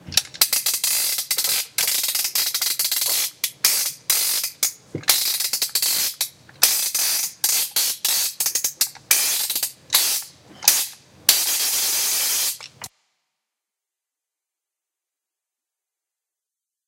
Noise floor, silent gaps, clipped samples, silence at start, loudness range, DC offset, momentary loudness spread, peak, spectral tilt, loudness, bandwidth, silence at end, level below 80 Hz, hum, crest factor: -87 dBFS; none; under 0.1%; 0.05 s; 2 LU; under 0.1%; 7 LU; 0 dBFS; 2 dB/octave; -19 LUFS; 17.5 kHz; 4 s; -66 dBFS; none; 24 dB